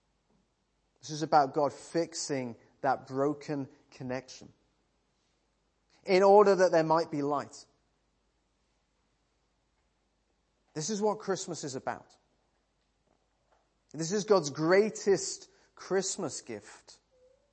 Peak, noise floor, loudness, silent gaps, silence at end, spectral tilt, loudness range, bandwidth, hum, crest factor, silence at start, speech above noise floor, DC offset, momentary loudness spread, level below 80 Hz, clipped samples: -10 dBFS; -76 dBFS; -29 LUFS; none; 0.8 s; -4.5 dB/octave; 11 LU; 8.8 kHz; none; 24 dB; 1.05 s; 47 dB; under 0.1%; 20 LU; -76 dBFS; under 0.1%